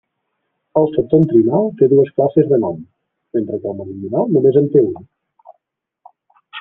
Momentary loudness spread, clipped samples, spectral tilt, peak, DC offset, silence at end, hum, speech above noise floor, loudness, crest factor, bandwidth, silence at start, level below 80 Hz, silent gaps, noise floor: 13 LU; under 0.1%; -11.5 dB/octave; 0 dBFS; under 0.1%; 0 s; none; 59 dB; -15 LUFS; 16 dB; 3.7 kHz; 0.75 s; -56 dBFS; none; -74 dBFS